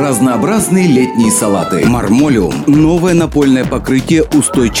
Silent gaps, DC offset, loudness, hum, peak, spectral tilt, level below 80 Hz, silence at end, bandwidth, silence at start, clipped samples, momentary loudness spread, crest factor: none; under 0.1%; -11 LUFS; none; 0 dBFS; -5.5 dB/octave; -30 dBFS; 0 s; 16.5 kHz; 0 s; under 0.1%; 3 LU; 10 dB